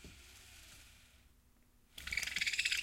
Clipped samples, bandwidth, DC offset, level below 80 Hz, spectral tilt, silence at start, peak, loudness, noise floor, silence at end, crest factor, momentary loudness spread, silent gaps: under 0.1%; 16.5 kHz; under 0.1%; -62 dBFS; 1 dB/octave; 0 s; -18 dBFS; -36 LUFS; -68 dBFS; 0 s; 24 dB; 23 LU; none